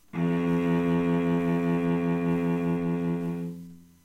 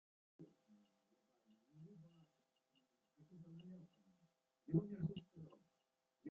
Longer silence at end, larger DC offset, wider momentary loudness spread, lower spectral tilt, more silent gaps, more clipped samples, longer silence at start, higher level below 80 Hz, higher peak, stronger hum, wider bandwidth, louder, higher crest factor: first, 0.25 s vs 0 s; neither; second, 7 LU vs 23 LU; about the same, -9 dB/octave vs -9.5 dB/octave; neither; neither; second, 0.15 s vs 0.4 s; first, -56 dBFS vs -82 dBFS; first, -14 dBFS vs -26 dBFS; neither; first, 7.8 kHz vs 3.9 kHz; first, -27 LUFS vs -46 LUFS; second, 12 dB vs 26 dB